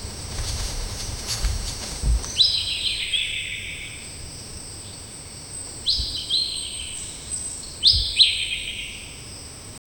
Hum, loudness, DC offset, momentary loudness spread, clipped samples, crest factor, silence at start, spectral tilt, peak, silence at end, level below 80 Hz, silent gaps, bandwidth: none; -22 LUFS; under 0.1%; 19 LU; under 0.1%; 22 dB; 0 s; -1 dB/octave; -4 dBFS; 0.2 s; -34 dBFS; none; 19 kHz